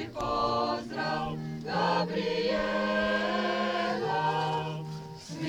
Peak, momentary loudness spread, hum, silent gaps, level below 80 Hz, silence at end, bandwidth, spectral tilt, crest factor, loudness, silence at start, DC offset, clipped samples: -16 dBFS; 8 LU; none; none; -54 dBFS; 0 s; 19.5 kHz; -5.5 dB/octave; 14 dB; -30 LUFS; 0 s; under 0.1%; under 0.1%